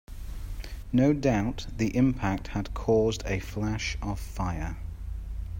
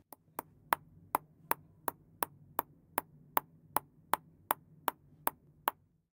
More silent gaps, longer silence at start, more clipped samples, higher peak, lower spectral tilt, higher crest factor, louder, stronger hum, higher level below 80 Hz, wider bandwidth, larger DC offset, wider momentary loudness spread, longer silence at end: neither; second, 0.1 s vs 0.7 s; neither; second, -10 dBFS vs -6 dBFS; first, -6.5 dB/octave vs -2.5 dB/octave; second, 18 dB vs 34 dB; first, -28 LUFS vs -39 LUFS; neither; first, -38 dBFS vs -76 dBFS; second, 16 kHz vs 18 kHz; neither; first, 16 LU vs 5 LU; second, 0 s vs 0.4 s